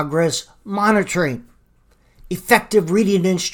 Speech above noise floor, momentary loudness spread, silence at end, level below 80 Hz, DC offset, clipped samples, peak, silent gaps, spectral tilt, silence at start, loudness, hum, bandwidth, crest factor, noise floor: 38 dB; 13 LU; 0 s; -50 dBFS; under 0.1%; under 0.1%; 0 dBFS; none; -4.5 dB/octave; 0 s; -18 LUFS; none; 19 kHz; 18 dB; -56 dBFS